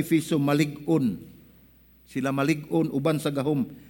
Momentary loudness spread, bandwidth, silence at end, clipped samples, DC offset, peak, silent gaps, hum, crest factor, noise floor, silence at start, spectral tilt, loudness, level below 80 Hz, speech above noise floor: 6 LU; 17 kHz; 0.05 s; under 0.1%; under 0.1%; -10 dBFS; none; none; 16 dB; -56 dBFS; 0 s; -6.5 dB/octave; -26 LUFS; -60 dBFS; 31 dB